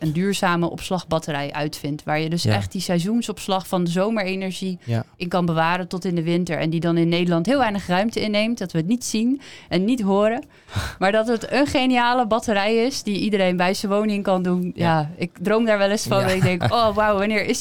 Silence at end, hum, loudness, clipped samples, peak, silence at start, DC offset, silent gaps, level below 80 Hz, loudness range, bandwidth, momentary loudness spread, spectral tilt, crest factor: 0 s; none; -21 LUFS; under 0.1%; -6 dBFS; 0 s; 0.5%; none; -50 dBFS; 3 LU; 18.5 kHz; 7 LU; -5.5 dB/octave; 14 dB